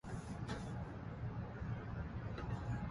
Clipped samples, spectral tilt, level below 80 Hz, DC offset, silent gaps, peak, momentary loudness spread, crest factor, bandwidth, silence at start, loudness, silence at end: under 0.1%; -7.5 dB/octave; -52 dBFS; under 0.1%; none; -30 dBFS; 3 LU; 14 dB; 11.5 kHz; 0.05 s; -46 LUFS; 0 s